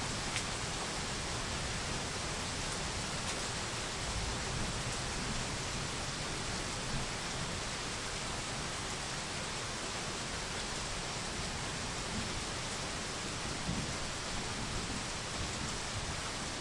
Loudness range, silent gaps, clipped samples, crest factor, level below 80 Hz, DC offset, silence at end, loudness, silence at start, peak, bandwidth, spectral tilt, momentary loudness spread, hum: 1 LU; none; under 0.1%; 20 dB; -48 dBFS; under 0.1%; 0 s; -37 LUFS; 0 s; -18 dBFS; 11.5 kHz; -2.5 dB/octave; 1 LU; none